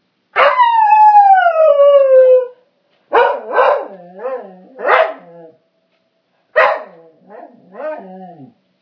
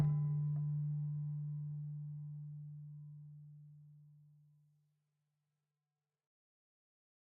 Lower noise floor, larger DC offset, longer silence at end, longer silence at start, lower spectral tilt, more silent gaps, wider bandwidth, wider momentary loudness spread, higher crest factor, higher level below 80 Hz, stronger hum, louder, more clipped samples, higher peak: second, -62 dBFS vs under -90 dBFS; neither; second, 0.55 s vs 3 s; first, 0.35 s vs 0 s; second, -4.5 dB/octave vs -14.5 dB/octave; neither; first, 5.4 kHz vs 2 kHz; second, 19 LU vs 22 LU; second, 14 dB vs 20 dB; first, -70 dBFS vs -76 dBFS; neither; first, -11 LUFS vs -42 LUFS; neither; first, 0 dBFS vs -24 dBFS